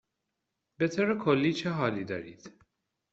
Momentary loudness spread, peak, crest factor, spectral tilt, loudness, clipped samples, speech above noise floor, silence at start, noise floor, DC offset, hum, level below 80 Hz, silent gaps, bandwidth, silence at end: 12 LU; -12 dBFS; 20 dB; -5 dB/octave; -29 LUFS; under 0.1%; 55 dB; 0.8 s; -84 dBFS; under 0.1%; none; -70 dBFS; none; 8 kHz; 0.65 s